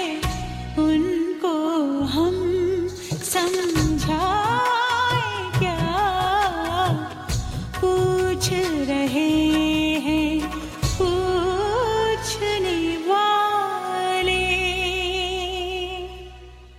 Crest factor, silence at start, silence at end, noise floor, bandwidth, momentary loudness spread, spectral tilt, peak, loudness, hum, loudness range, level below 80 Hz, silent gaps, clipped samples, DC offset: 14 dB; 0 s; 0 s; -42 dBFS; 16 kHz; 8 LU; -4.5 dB/octave; -8 dBFS; -22 LUFS; none; 1 LU; -38 dBFS; none; under 0.1%; under 0.1%